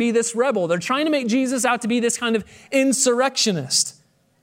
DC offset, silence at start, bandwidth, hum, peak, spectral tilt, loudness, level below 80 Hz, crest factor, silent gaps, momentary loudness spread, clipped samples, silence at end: under 0.1%; 0 s; 16 kHz; none; -6 dBFS; -3 dB/octave; -20 LUFS; -66 dBFS; 16 dB; none; 5 LU; under 0.1%; 0.5 s